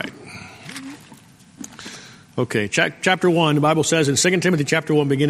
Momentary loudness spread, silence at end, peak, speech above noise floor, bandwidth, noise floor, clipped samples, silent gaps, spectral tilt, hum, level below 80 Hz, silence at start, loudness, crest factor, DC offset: 20 LU; 0 s; -2 dBFS; 29 dB; 15 kHz; -47 dBFS; under 0.1%; none; -4.5 dB/octave; none; -58 dBFS; 0 s; -18 LUFS; 20 dB; under 0.1%